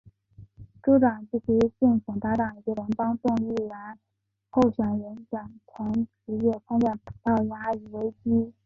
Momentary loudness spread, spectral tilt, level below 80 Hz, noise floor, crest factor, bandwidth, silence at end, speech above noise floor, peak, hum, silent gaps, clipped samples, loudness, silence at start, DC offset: 14 LU; -9 dB/octave; -56 dBFS; -52 dBFS; 18 dB; 6.8 kHz; 0.15 s; 26 dB; -10 dBFS; none; none; under 0.1%; -26 LUFS; 0.4 s; under 0.1%